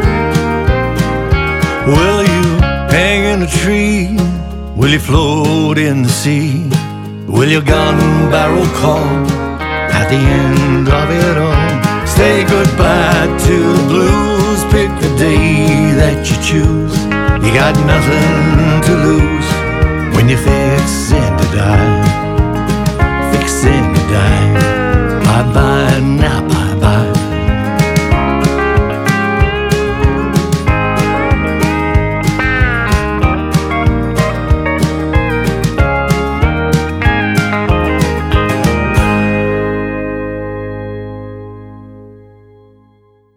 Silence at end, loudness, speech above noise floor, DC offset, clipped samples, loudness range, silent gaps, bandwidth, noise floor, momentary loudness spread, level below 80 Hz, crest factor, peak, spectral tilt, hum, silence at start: 1.25 s; -12 LUFS; 39 dB; under 0.1%; under 0.1%; 3 LU; none; 16.5 kHz; -49 dBFS; 5 LU; -20 dBFS; 12 dB; 0 dBFS; -6 dB/octave; none; 0 s